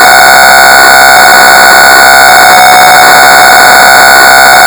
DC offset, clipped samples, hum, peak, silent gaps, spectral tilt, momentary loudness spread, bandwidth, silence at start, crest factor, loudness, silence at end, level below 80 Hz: 0.4%; 50%; none; 0 dBFS; none; 0 dB/octave; 0 LU; over 20 kHz; 0 s; 0 dB; 1 LUFS; 0 s; -32 dBFS